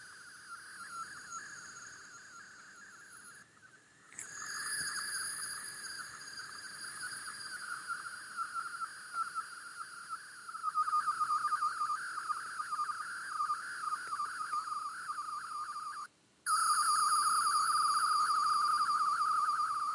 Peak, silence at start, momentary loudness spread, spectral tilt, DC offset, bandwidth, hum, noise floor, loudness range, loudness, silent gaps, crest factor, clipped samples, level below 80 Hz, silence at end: -20 dBFS; 0 s; 19 LU; 1.5 dB/octave; under 0.1%; 11.5 kHz; none; -61 dBFS; 16 LU; -35 LUFS; none; 16 dB; under 0.1%; -84 dBFS; 0 s